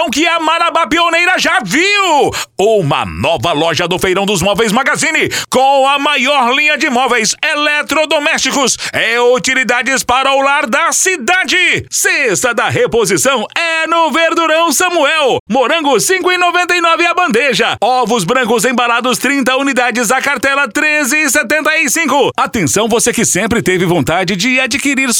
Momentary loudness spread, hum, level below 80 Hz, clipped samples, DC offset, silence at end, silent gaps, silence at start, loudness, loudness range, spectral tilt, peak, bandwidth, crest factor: 3 LU; none; -44 dBFS; under 0.1%; under 0.1%; 0 s; 15.40-15.46 s; 0 s; -11 LUFS; 1 LU; -2.5 dB/octave; 0 dBFS; over 20 kHz; 12 dB